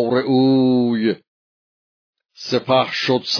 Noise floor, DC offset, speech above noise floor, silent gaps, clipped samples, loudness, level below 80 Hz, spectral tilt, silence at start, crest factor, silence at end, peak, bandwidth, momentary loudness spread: under -90 dBFS; under 0.1%; over 73 dB; 1.28-2.13 s; under 0.1%; -17 LUFS; -68 dBFS; -6 dB/octave; 0 s; 16 dB; 0 s; -4 dBFS; 5.4 kHz; 8 LU